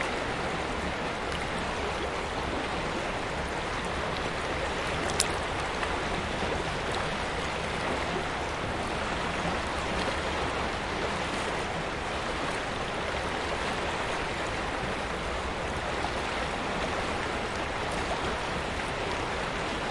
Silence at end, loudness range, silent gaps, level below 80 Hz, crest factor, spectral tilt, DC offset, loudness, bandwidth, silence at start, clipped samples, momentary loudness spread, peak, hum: 0 s; 1 LU; none; -42 dBFS; 28 dB; -4 dB/octave; under 0.1%; -31 LUFS; 11.5 kHz; 0 s; under 0.1%; 2 LU; -2 dBFS; none